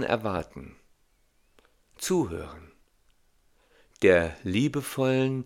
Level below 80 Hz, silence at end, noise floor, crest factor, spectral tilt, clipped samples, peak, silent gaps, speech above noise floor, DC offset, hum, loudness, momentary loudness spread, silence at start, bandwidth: -56 dBFS; 0 s; -67 dBFS; 22 dB; -5.5 dB/octave; under 0.1%; -6 dBFS; none; 40 dB; under 0.1%; none; -26 LUFS; 18 LU; 0 s; 17 kHz